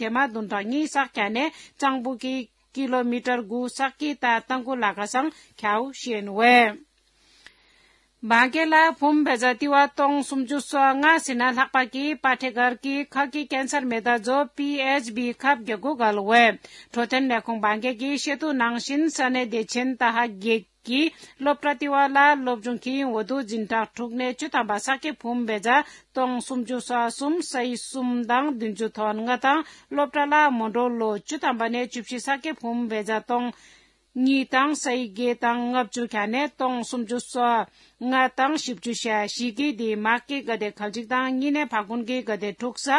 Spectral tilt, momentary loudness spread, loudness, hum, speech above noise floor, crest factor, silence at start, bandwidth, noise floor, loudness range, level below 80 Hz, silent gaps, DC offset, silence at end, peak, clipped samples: -3 dB/octave; 10 LU; -24 LUFS; none; 38 dB; 20 dB; 0 s; 12 kHz; -62 dBFS; 5 LU; -70 dBFS; none; under 0.1%; 0 s; -4 dBFS; under 0.1%